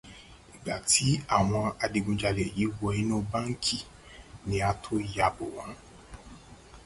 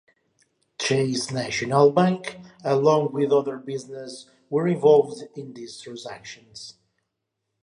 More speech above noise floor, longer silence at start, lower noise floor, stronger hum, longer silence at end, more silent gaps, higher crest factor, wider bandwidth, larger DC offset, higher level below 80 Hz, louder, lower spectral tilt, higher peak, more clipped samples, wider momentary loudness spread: second, 22 dB vs 57 dB; second, 0.05 s vs 0.8 s; second, -51 dBFS vs -80 dBFS; neither; second, 0 s vs 0.9 s; neither; about the same, 20 dB vs 18 dB; about the same, 11.5 kHz vs 11 kHz; neither; first, -48 dBFS vs -68 dBFS; second, -29 LUFS vs -22 LUFS; second, -4 dB/octave vs -5.5 dB/octave; second, -10 dBFS vs -6 dBFS; neither; first, 24 LU vs 21 LU